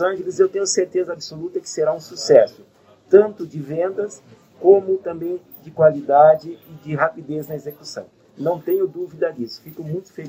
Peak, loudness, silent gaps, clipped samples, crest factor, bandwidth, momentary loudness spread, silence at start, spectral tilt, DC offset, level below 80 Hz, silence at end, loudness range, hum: 0 dBFS; -19 LUFS; none; under 0.1%; 20 dB; 16 kHz; 17 LU; 0 s; -5 dB/octave; under 0.1%; -66 dBFS; 0 s; 7 LU; none